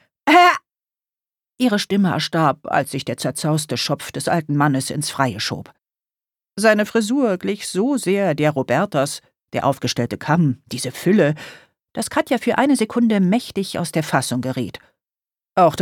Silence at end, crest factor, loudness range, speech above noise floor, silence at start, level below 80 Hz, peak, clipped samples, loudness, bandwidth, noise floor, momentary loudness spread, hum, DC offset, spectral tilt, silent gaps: 0 s; 18 dB; 2 LU; over 71 dB; 0.25 s; -60 dBFS; -2 dBFS; under 0.1%; -19 LUFS; 18.5 kHz; under -90 dBFS; 9 LU; none; under 0.1%; -5 dB/octave; none